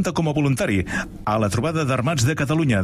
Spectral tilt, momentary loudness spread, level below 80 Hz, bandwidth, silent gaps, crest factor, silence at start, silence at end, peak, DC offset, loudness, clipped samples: -6 dB/octave; 4 LU; -42 dBFS; 15.5 kHz; none; 12 dB; 0 s; 0 s; -8 dBFS; under 0.1%; -21 LUFS; under 0.1%